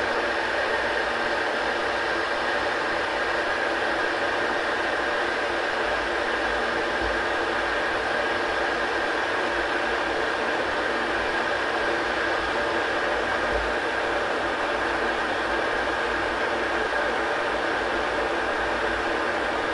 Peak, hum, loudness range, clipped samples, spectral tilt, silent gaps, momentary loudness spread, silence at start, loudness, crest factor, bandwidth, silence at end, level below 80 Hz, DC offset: -12 dBFS; none; 0 LU; under 0.1%; -3.5 dB/octave; none; 1 LU; 0 s; -25 LUFS; 14 dB; 11.5 kHz; 0 s; -46 dBFS; under 0.1%